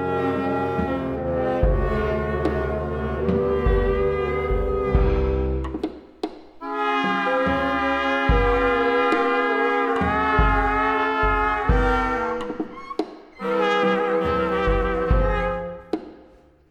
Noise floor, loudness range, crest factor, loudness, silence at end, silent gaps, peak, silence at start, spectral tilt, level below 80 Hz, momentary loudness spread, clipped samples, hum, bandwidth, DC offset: -51 dBFS; 4 LU; 16 dB; -22 LUFS; 0.45 s; none; -6 dBFS; 0 s; -7.5 dB/octave; -28 dBFS; 11 LU; under 0.1%; none; 8.2 kHz; under 0.1%